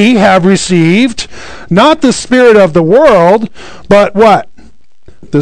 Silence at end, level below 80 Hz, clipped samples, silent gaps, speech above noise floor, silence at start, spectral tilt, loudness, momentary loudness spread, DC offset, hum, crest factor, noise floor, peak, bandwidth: 0 s; -36 dBFS; 8%; none; 36 dB; 0 s; -5.5 dB/octave; -7 LUFS; 10 LU; 3%; none; 8 dB; -43 dBFS; 0 dBFS; 12 kHz